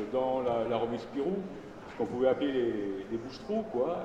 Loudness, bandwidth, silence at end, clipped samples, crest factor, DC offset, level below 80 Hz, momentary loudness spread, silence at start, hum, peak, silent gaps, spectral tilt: -32 LUFS; 8.6 kHz; 0 s; under 0.1%; 18 dB; under 0.1%; -60 dBFS; 10 LU; 0 s; none; -14 dBFS; none; -7 dB/octave